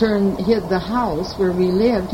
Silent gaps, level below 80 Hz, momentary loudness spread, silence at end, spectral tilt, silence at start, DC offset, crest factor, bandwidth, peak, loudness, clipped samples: none; -38 dBFS; 4 LU; 0 s; -7.5 dB/octave; 0 s; under 0.1%; 14 dB; 16.5 kHz; -4 dBFS; -19 LUFS; under 0.1%